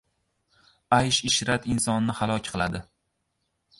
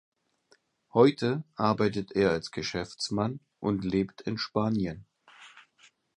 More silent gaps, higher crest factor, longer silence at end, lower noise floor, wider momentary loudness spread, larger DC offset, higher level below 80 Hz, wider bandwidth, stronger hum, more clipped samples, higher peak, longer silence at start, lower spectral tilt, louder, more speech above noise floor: neither; about the same, 22 dB vs 24 dB; first, 1 s vs 0.55 s; first, -77 dBFS vs -67 dBFS; about the same, 8 LU vs 10 LU; neither; first, -50 dBFS vs -58 dBFS; about the same, 11.5 kHz vs 11.5 kHz; neither; neither; about the same, -6 dBFS vs -6 dBFS; about the same, 0.9 s vs 0.95 s; second, -3.5 dB/octave vs -6 dB/octave; first, -25 LUFS vs -29 LUFS; first, 52 dB vs 39 dB